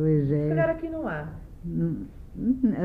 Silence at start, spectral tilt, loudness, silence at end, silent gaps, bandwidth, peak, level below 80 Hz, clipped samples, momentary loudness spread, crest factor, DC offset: 0 s; -11 dB/octave; -27 LUFS; 0 s; none; 3.6 kHz; -12 dBFS; -44 dBFS; under 0.1%; 14 LU; 14 dB; under 0.1%